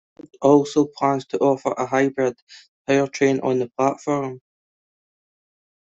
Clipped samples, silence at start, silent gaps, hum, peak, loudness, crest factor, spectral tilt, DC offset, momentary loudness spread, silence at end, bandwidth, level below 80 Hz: under 0.1%; 0.4 s; 2.42-2.47 s, 2.68-2.85 s; none; -4 dBFS; -21 LUFS; 18 dB; -6 dB/octave; under 0.1%; 8 LU; 1.6 s; 7.8 kHz; -64 dBFS